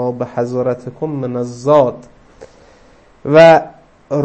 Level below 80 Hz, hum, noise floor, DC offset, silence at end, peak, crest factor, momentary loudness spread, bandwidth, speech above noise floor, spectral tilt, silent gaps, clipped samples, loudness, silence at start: -52 dBFS; none; -46 dBFS; under 0.1%; 0 s; 0 dBFS; 14 dB; 16 LU; 8.6 kHz; 33 dB; -7 dB/octave; none; 0.3%; -13 LUFS; 0 s